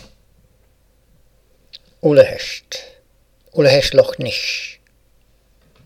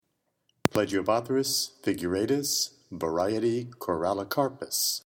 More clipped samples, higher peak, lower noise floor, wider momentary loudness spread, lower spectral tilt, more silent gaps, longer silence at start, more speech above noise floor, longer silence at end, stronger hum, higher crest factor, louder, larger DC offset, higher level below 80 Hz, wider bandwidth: neither; about the same, 0 dBFS vs 0 dBFS; second, -56 dBFS vs -75 dBFS; first, 17 LU vs 5 LU; about the same, -4.5 dB/octave vs -3.5 dB/octave; neither; first, 2.05 s vs 0.65 s; second, 41 dB vs 47 dB; first, 1.15 s vs 0.05 s; neither; second, 20 dB vs 28 dB; first, -16 LUFS vs -28 LUFS; neither; first, -46 dBFS vs -62 dBFS; second, 15.5 kHz vs 19 kHz